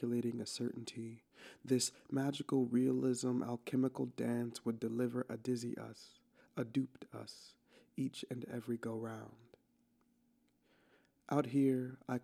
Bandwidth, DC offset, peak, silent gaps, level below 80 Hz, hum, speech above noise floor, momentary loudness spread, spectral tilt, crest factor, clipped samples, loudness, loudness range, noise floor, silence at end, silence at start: 14.5 kHz; under 0.1%; -20 dBFS; none; -84 dBFS; none; 37 dB; 17 LU; -5.5 dB/octave; 20 dB; under 0.1%; -39 LUFS; 9 LU; -76 dBFS; 0 s; 0 s